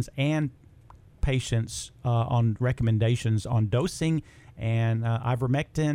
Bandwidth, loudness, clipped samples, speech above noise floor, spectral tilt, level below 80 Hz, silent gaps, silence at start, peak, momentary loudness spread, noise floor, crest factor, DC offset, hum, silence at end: 11.5 kHz; -27 LUFS; under 0.1%; 27 dB; -6.5 dB/octave; -42 dBFS; none; 0 s; -12 dBFS; 7 LU; -52 dBFS; 14 dB; under 0.1%; none; 0 s